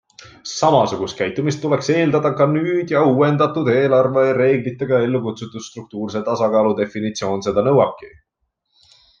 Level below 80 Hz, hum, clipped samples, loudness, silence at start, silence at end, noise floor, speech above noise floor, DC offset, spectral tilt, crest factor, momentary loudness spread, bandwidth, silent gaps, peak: -58 dBFS; none; under 0.1%; -18 LUFS; 0.2 s; 1.1 s; -73 dBFS; 56 dB; under 0.1%; -6.5 dB/octave; 16 dB; 12 LU; 7.6 kHz; none; -2 dBFS